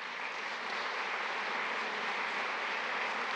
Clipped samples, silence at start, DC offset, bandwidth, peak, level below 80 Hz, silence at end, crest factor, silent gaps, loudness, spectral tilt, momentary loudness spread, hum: under 0.1%; 0 s; under 0.1%; 11.5 kHz; -22 dBFS; under -90 dBFS; 0 s; 14 dB; none; -35 LUFS; -1.5 dB/octave; 3 LU; none